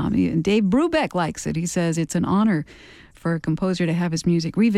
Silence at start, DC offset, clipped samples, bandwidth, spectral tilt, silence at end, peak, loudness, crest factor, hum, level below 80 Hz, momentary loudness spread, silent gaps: 0 s; under 0.1%; under 0.1%; 13 kHz; -6 dB/octave; 0 s; -10 dBFS; -22 LUFS; 12 dB; none; -48 dBFS; 7 LU; none